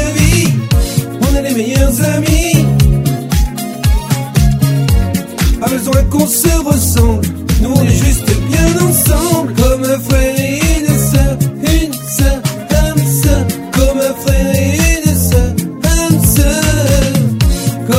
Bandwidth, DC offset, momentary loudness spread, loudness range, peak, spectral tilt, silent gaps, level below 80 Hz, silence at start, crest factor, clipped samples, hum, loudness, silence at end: 16.5 kHz; under 0.1%; 5 LU; 2 LU; 0 dBFS; -5 dB/octave; none; -16 dBFS; 0 s; 10 dB; 0.2%; none; -12 LUFS; 0 s